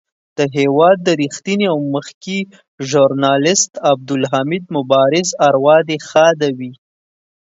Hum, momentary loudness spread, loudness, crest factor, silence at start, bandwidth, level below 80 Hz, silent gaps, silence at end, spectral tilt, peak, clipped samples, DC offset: none; 11 LU; -14 LUFS; 14 dB; 0.4 s; 8 kHz; -64 dBFS; 2.14-2.21 s, 2.68-2.78 s; 0.8 s; -4 dB/octave; 0 dBFS; under 0.1%; under 0.1%